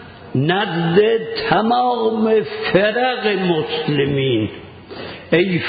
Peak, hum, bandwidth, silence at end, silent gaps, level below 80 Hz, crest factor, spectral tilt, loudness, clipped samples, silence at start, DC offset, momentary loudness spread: -2 dBFS; none; 5 kHz; 0 s; none; -50 dBFS; 16 dB; -11.5 dB/octave; -17 LUFS; under 0.1%; 0 s; under 0.1%; 11 LU